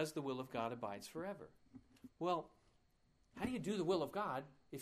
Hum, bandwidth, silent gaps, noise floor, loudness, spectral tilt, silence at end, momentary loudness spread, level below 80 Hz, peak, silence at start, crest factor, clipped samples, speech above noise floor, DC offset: none; 15.5 kHz; none; -76 dBFS; -43 LUFS; -5.5 dB/octave; 0 s; 21 LU; -74 dBFS; -26 dBFS; 0 s; 18 dB; under 0.1%; 33 dB; under 0.1%